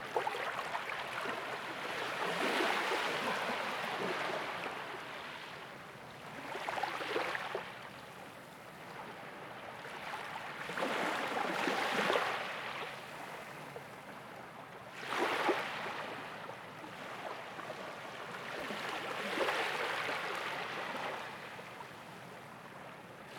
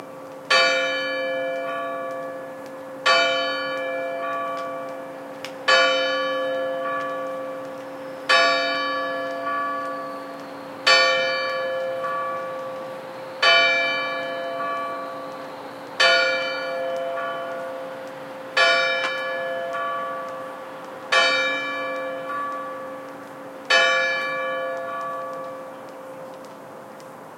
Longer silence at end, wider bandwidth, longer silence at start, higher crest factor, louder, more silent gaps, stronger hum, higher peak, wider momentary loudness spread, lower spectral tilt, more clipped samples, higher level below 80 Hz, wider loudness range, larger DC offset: about the same, 0 s vs 0 s; first, 19.5 kHz vs 16 kHz; about the same, 0 s vs 0 s; about the same, 22 dB vs 22 dB; second, -38 LUFS vs -22 LUFS; neither; neither; second, -18 dBFS vs -2 dBFS; second, 15 LU vs 19 LU; first, -3 dB/octave vs -1.5 dB/octave; neither; first, -76 dBFS vs -82 dBFS; first, 7 LU vs 3 LU; neither